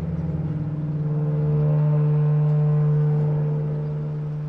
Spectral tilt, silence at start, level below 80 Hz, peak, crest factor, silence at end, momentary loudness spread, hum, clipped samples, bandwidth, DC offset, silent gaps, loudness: -12 dB/octave; 0 s; -46 dBFS; -14 dBFS; 8 dB; 0 s; 7 LU; none; under 0.1%; 2.8 kHz; under 0.1%; none; -22 LUFS